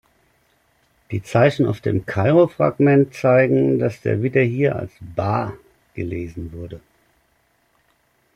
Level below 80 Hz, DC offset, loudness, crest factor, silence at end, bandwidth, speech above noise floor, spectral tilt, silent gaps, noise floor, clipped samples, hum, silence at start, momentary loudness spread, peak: -52 dBFS; under 0.1%; -19 LUFS; 18 dB; 1.6 s; 12 kHz; 45 dB; -8.5 dB/octave; none; -63 dBFS; under 0.1%; none; 1.1 s; 16 LU; -4 dBFS